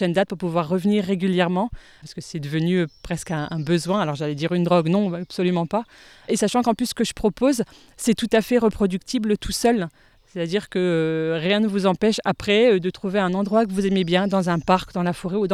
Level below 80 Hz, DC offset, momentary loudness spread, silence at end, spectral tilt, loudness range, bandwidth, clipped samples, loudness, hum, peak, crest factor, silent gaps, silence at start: -48 dBFS; under 0.1%; 8 LU; 0 s; -5.5 dB/octave; 3 LU; 15 kHz; under 0.1%; -22 LUFS; none; -4 dBFS; 18 dB; none; 0 s